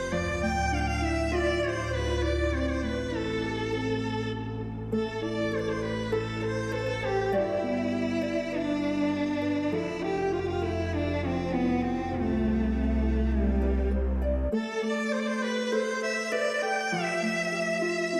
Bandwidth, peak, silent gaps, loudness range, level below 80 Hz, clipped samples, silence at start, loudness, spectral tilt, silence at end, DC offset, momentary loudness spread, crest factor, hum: 12 kHz; -16 dBFS; none; 3 LU; -36 dBFS; under 0.1%; 0 s; -29 LUFS; -6 dB/octave; 0 s; under 0.1%; 3 LU; 12 dB; none